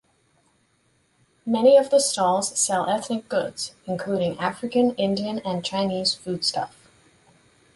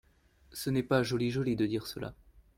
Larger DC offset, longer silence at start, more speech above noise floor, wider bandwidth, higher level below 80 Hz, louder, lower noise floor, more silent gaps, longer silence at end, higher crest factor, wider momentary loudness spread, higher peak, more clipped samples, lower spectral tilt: neither; first, 1.45 s vs 0.5 s; first, 43 dB vs 32 dB; second, 11.5 kHz vs 16.5 kHz; second, -64 dBFS vs -58 dBFS; first, -23 LUFS vs -32 LUFS; about the same, -65 dBFS vs -64 dBFS; neither; first, 1.05 s vs 0.15 s; about the same, 18 dB vs 20 dB; about the same, 13 LU vs 14 LU; first, -6 dBFS vs -14 dBFS; neither; second, -3.5 dB/octave vs -6 dB/octave